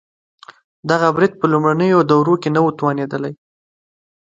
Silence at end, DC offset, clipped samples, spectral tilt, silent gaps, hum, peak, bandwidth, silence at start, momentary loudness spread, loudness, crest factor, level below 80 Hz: 0.95 s; under 0.1%; under 0.1%; -7.5 dB/octave; none; none; 0 dBFS; 7.8 kHz; 0.85 s; 11 LU; -16 LUFS; 18 dB; -62 dBFS